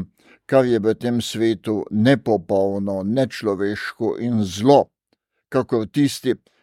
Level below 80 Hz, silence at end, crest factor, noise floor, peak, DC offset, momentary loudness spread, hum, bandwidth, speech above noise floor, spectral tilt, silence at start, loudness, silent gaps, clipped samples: -60 dBFS; 0.25 s; 18 dB; -70 dBFS; -2 dBFS; under 0.1%; 8 LU; none; 16 kHz; 51 dB; -6.5 dB/octave; 0 s; -20 LUFS; none; under 0.1%